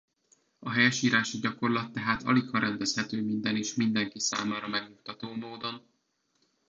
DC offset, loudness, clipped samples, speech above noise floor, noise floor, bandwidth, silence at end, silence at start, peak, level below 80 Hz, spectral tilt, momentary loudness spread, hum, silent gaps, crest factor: under 0.1%; -29 LUFS; under 0.1%; 46 dB; -75 dBFS; 7.8 kHz; 0.9 s; 0.6 s; -10 dBFS; -68 dBFS; -3.5 dB/octave; 14 LU; none; none; 20 dB